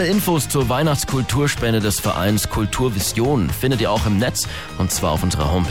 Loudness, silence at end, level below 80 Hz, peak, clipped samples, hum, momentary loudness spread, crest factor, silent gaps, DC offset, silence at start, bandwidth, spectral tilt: -19 LUFS; 0 s; -34 dBFS; -6 dBFS; under 0.1%; none; 2 LU; 12 dB; none; 1%; 0 s; 18.5 kHz; -4.5 dB/octave